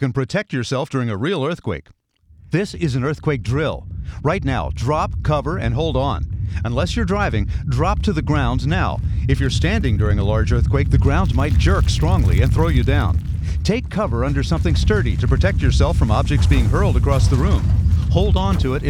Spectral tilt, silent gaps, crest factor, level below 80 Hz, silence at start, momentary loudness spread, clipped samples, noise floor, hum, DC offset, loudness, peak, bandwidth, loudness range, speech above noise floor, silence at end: -7 dB/octave; none; 16 dB; -22 dBFS; 0 s; 6 LU; under 0.1%; -48 dBFS; none; under 0.1%; -19 LUFS; -2 dBFS; 11.5 kHz; 6 LU; 30 dB; 0 s